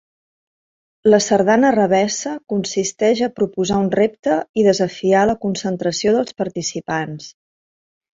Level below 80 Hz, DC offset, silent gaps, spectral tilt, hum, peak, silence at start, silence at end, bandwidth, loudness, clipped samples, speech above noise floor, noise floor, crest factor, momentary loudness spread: -54 dBFS; under 0.1%; 4.19-4.23 s, 4.49-4.54 s; -4.5 dB/octave; none; -2 dBFS; 1.05 s; 0.9 s; 8 kHz; -18 LUFS; under 0.1%; over 73 dB; under -90 dBFS; 16 dB; 10 LU